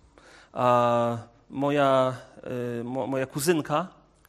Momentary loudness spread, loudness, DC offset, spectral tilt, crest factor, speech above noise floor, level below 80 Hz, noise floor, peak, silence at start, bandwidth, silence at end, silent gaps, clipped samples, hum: 16 LU; -26 LUFS; under 0.1%; -5.5 dB/octave; 18 dB; 28 dB; -64 dBFS; -53 dBFS; -8 dBFS; 0.55 s; 13 kHz; 0.4 s; none; under 0.1%; none